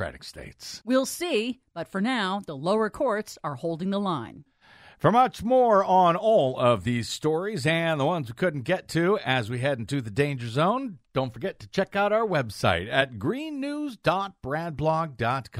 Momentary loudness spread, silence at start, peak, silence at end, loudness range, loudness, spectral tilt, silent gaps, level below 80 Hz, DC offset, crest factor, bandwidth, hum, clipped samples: 11 LU; 0 s; -6 dBFS; 0 s; 5 LU; -26 LUFS; -5.5 dB/octave; none; -56 dBFS; under 0.1%; 20 dB; 16 kHz; none; under 0.1%